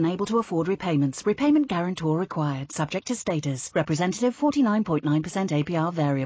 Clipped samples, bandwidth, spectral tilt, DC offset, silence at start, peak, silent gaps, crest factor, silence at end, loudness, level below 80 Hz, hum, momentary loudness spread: under 0.1%; 8 kHz; -6 dB/octave; under 0.1%; 0 s; -12 dBFS; none; 12 dB; 0 s; -25 LUFS; -60 dBFS; none; 6 LU